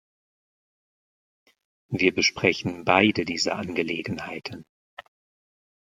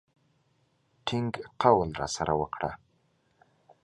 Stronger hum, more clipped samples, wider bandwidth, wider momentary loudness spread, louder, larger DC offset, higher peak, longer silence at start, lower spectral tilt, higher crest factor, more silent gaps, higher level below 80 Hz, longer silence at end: neither; neither; first, 13.5 kHz vs 11.5 kHz; about the same, 15 LU vs 13 LU; first, -24 LUFS vs -29 LUFS; neither; first, -2 dBFS vs -6 dBFS; first, 1.9 s vs 1.05 s; about the same, -4 dB/octave vs -5 dB/octave; about the same, 26 dB vs 24 dB; first, 4.69-4.97 s vs none; second, -64 dBFS vs -54 dBFS; second, 0.8 s vs 1.1 s